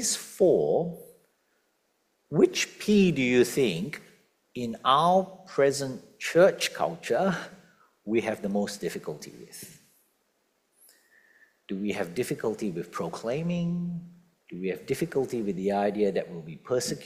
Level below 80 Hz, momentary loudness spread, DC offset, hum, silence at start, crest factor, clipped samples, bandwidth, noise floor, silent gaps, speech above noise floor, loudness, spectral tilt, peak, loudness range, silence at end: -66 dBFS; 18 LU; under 0.1%; none; 0 s; 22 dB; under 0.1%; 16 kHz; -73 dBFS; none; 46 dB; -27 LUFS; -5 dB/octave; -6 dBFS; 11 LU; 0 s